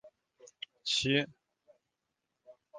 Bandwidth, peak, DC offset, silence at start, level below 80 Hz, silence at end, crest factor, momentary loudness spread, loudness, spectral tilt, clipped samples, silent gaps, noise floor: 9.6 kHz; -14 dBFS; under 0.1%; 0.05 s; -70 dBFS; 0 s; 24 dB; 19 LU; -32 LUFS; -3.5 dB/octave; under 0.1%; none; -86 dBFS